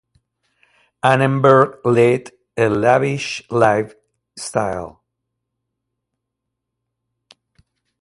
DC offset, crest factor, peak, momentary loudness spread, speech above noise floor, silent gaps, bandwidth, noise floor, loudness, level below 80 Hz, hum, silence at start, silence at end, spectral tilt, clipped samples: under 0.1%; 20 dB; 0 dBFS; 17 LU; 63 dB; none; 11.5 kHz; -79 dBFS; -16 LUFS; -54 dBFS; none; 1.05 s; 3.1 s; -6 dB/octave; under 0.1%